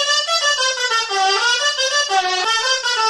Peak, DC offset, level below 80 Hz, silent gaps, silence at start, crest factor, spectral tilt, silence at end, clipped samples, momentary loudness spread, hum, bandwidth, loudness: -6 dBFS; under 0.1%; -66 dBFS; none; 0 s; 12 dB; 2.5 dB/octave; 0 s; under 0.1%; 2 LU; none; 11.5 kHz; -16 LUFS